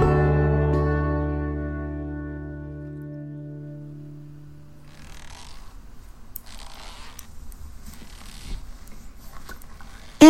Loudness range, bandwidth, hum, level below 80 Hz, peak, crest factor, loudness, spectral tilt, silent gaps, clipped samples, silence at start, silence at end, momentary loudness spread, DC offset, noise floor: 16 LU; 16.5 kHz; none; -34 dBFS; 0 dBFS; 24 dB; -27 LUFS; -6.5 dB/octave; none; under 0.1%; 0 s; 0 s; 25 LU; under 0.1%; -46 dBFS